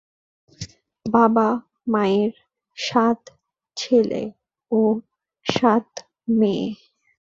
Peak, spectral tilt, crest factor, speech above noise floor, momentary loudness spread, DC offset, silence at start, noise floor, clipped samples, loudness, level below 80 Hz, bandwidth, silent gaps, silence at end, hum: -2 dBFS; -5.5 dB/octave; 20 dB; 20 dB; 20 LU; under 0.1%; 0.6 s; -40 dBFS; under 0.1%; -21 LUFS; -60 dBFS; 7.6 kHz; none; 0.6 s; none